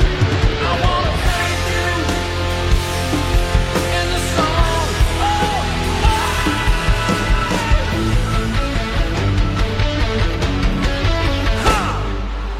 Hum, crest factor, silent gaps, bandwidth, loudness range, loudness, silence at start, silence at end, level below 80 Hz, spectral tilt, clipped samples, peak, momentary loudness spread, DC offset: none; 14 dB; none; 15 kHz; 1 LU; -18 LUFS; 0 s; 0 s; -20 dBFS; -5 dB/octave; under 0.1%; -2 dBFS; 3 LU; under 0.1%